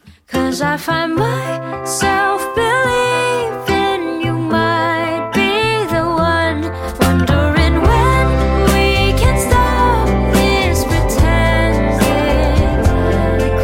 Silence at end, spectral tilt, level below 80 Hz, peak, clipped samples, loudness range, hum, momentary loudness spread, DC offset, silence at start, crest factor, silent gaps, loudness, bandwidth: 0 s; -5.5 dB/octave; -22 dBFS; 0 dBFS; under 0.1%; 3 LU; none; 5 LU; under 0.1%; 0.05 s; 12 dB; none; -14 LUFS; 17 kHz